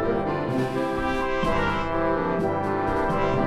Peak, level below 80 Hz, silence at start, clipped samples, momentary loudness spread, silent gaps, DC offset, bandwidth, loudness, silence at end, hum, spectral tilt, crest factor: -10 dBFS; -38 dBFS; 0 s; under 0.1%; 2 LU; none; under 0.1%; 14 kHz; -25 LUFS; 0 s; 50 Hz at -45 dBFS; -7 dB/octave; 14 dB